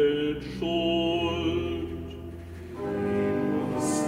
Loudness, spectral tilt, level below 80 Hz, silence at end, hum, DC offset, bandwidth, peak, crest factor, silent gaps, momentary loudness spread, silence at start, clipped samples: -28 LUFS; -5 dB/octave; -48 dBFS; 0 s; none; under 0.1%; 15.5 kHz; -14 dBFS; 14 dB; none; 14 LU; 0 s; under 0.1%